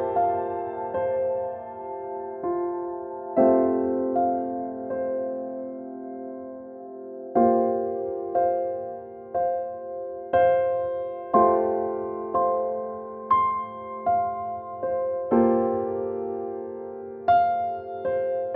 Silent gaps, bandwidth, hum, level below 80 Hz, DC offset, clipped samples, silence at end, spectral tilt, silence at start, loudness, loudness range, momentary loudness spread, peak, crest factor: none; 4.4 kHz; none; -62 dBFS; under 0.1%; under 0.1%; 0 s; -10.5 dB/octave; 0 s; -26 LUFS; 4 LU; 15 LU; -6 dBFS; 20 dB